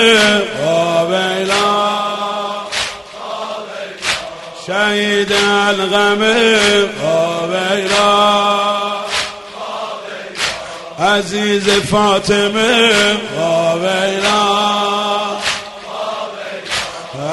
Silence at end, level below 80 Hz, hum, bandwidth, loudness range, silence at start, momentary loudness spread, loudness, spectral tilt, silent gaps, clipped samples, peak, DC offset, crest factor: 0 s; -48 dBFS; none; 12 kHz; 5 LU; 0 s; 14 LU; -14 LUFS; -3 dB/octave; none; under 0.1%; 0 dBFS; under 0.1%; 14 dB